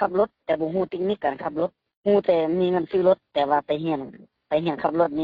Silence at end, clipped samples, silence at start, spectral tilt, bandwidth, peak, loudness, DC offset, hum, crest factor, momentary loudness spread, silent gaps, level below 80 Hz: 0 s; under 0.1%; 0 s; -5 dB/octave; 5 kHz; -6 dBFS; -24 LUFS; under 0.1%; none; 16 dB; 8 LU; 1.97-2.04 s; -62 dBFS